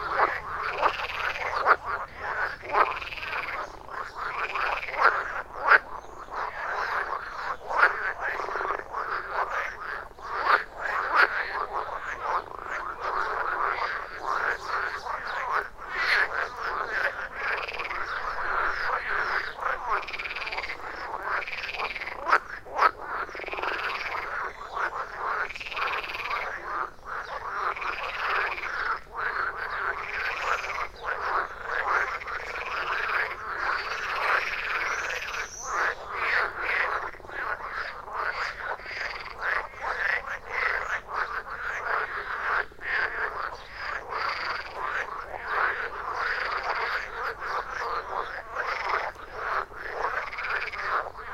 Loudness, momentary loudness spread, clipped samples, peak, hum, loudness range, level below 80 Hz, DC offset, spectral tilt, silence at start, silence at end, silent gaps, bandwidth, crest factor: -29 LUFS; 9 LU; under 0.1%; -4 dBFS; none; 4 LU; -52 dBFS; under 0.1%; -2 dB/octave; 0 s; 0 s; none; 16 kHz; 26 dB